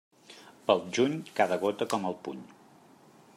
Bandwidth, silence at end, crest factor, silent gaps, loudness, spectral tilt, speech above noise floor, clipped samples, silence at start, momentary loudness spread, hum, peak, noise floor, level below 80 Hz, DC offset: 15.5 kHz; 0.9 s; 24 dB; none; -30 LUFS; -4.5 dB/octave; 28 dB; under 0.1%; 0.3 s; 18 LU; none; -8 dBFS; -57 dBFS; -78 dBFS; under 0.1%